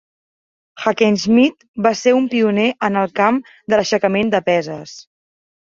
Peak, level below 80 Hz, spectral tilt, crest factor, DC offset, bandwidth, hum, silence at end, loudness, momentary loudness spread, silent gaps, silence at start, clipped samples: -2 dBFS; -58 dBFS; -5 dB/octave; 16 dB; under 0.1%; 7.6 kHz; none; 0.65 s; -16 LUFS; 8 LU; 1.68-1.74 s; 0.75 s; under 0.1%